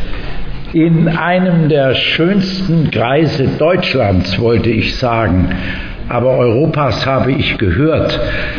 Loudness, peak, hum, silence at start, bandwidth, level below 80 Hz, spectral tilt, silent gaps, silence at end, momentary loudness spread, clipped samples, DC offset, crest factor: -13 LUFS; -2 dBFS; none; 0 s; 5.4 kHz; -28 dBFS; -7.5 dB/octave; none; 0 s; 7 LU; under 0.1%; under 0.1%; 10 dB